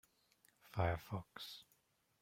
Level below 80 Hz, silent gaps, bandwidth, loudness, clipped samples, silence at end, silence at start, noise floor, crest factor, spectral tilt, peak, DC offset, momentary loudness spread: -64 dBFS; none; 16 kHz; -44 LUFS; under 0.1%; 0.6 s; 0.65 s; -78 dBFS; 24 dB; -6 dB/octave; -22 dBFS; under 0.1%; 12 LU